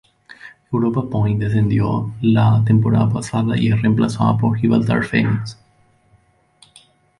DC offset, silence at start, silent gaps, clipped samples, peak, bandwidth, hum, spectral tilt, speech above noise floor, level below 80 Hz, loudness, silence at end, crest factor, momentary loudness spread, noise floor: under 0.1%; 0.45 s; none; under 0.1%; -4 dBFS; 11 kHz; none; -8 dB/octave; 40 dB; -44 dBFS; -17 LUFS; 1.65 s; 14 dB; 6 LU; -57 dBFS